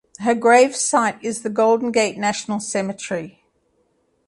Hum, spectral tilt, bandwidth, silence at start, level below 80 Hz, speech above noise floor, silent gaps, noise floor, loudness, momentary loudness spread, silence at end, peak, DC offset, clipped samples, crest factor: none; -3.5 dB/octave; 11.5 kHz; 0.2 s; -66 dBFS; 46 dB; none; -65 dBFS; -19 LUFS; 13 LU; 0.95 s; -2 dBFS; under 0.1%; under 0.1%; 18 dB